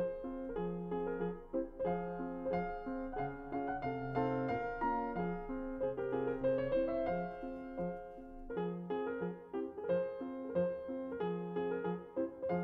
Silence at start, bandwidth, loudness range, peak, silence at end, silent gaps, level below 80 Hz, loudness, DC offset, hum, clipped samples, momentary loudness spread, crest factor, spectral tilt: 0 s; 5.4 kHz; 3 LU; -22 dBFS; 0 s; none; -56 dBFS; -39 LUFS; under 0.1%; none; under 0.1%; 7 LU; 16 dB; -10 dB/octave